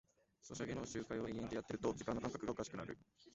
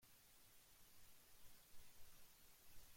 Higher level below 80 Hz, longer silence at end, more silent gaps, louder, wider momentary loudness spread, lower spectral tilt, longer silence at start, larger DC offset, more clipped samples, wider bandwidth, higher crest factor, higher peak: first, -66 dBFS vs -74 dBFS; about the same, 0.05 s vs 0 s; neither; first, -45 LUFS vs -68 LUFS; first, 11 LU vs 1 LU; first, -5.5 dB/octave vs -1.5 dB/octave; first, 0.45 s vs 0 s; neither; neither; second, 8 kHz vs 16.5 kHz; first, 20 dB vs 14 dB; first, -26 dBFS vs -48 dBFS